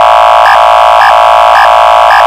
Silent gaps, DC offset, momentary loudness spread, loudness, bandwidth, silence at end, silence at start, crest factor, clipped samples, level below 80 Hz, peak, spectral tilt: none; under 0.1%; 0 LU; -3 LUFS; 16.5 kHz; 0 s; 0 s; 2 dB; 10%; -34 dBFS; 0 dBFS; -1 dB/octave